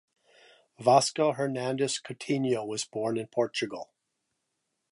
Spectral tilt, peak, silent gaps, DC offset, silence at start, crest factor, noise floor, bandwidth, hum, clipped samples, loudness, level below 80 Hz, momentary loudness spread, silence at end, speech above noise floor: -4 dB/octave; -6 dBFS; none; under 0.1%; 0.8 s; 24 dB; -81 dBFS; 11.5 kHz; none; under 0.1%; -28 LUFS; -78 dBFS; 11 LU; 1.1 s; 53 dB